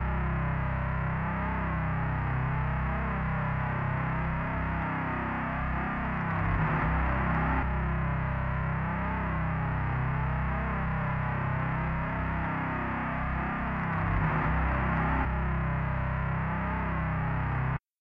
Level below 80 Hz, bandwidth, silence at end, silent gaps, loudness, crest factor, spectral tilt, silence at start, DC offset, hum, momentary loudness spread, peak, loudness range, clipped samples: -36 dBFS; 4.6 kHz; 0.2 s; none; -30 LUFS; 12 dB; -10 dB/octave; 0 s; under 0.1%; none; 3 LU; -18 dBFS; 1 LU; under 0.1%